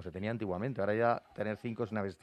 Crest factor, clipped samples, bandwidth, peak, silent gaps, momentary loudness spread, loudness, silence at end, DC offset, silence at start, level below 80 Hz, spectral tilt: 20 dB; under 0.1%; 11 kHz; -16 dBFS; none; 7 LU; -35 LUFS; 0.1 s; under 0.1%; 0 s; -70 dBFS; -8.5 dB/octave